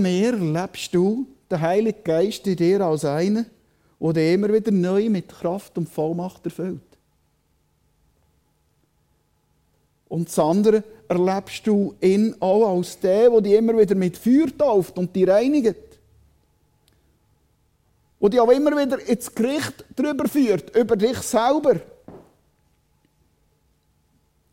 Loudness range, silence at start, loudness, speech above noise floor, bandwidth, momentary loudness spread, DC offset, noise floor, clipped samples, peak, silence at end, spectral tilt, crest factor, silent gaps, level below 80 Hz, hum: 10 LU; 0 s; -21 LUFS; 46 dB; 16 kHz; 11 LU; under 0.1%; -66 dBFS; under 0.1%; -4 dBFS; 2.35 s; -6.5 dB/octave; 18 dB; none; -58 dBFS; none